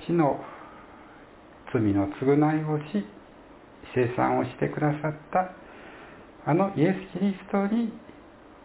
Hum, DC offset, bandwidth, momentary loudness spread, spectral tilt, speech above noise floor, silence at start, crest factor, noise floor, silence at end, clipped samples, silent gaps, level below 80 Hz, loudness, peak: none; under 0.1%; 4 kHz; 22 LU; -7.5 dB/octave; 24 dB; 0 s; 18 dB; -50 dBFS; 0.45 s; under 0.1%; none; -56 dBFS; -27 LUFS; -10 dBFS